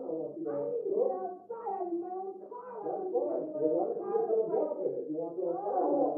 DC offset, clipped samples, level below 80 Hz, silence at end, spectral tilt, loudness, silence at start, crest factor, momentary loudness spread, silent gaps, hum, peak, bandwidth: under 0.1%; under 0.1%; under -90 dBFS; 0 s; -11 dB/octave; -34 LUFS; 0 s; 16 dB; 10 LU; none; none; -16 dBFS; 2.1 kHz